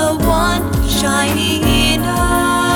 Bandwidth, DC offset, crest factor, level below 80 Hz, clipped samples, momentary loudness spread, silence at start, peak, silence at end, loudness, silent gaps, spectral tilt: over 20 kHz; under 0.1%; 12 dB; -22 dBFS; under 0.1%; 3 LU; 0 s; -2 dBFS; 0 s; -14 LUFS; none; -4 dB/octave